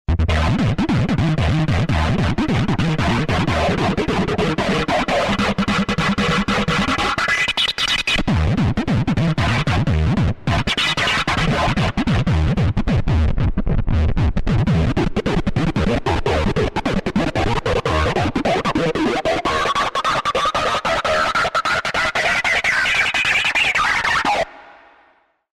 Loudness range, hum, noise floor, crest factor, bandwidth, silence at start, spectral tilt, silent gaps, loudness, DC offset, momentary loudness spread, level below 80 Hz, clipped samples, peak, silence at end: 3 LU; none; -57 dBFS; 12 dB; 13.5 kHz; 0.1 s; -5.5 dB/octave; none; -18 LUFS; under 0.1%; 4 LU; -28 dBFS; under 0.1%; -6 dBFS; 0.9 s